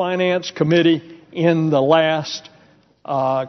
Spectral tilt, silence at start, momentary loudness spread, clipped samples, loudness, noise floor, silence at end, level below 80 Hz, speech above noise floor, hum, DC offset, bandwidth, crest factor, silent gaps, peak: -4.5 dB/octave; 0 s; 12 LU; under 0.1%; -18 LUFS; -53 dBFS; 0 s; -62 dBFS; 35 dB; none; under 0.1%; 6.4 kHz; 16 dB; none; -2 dBFS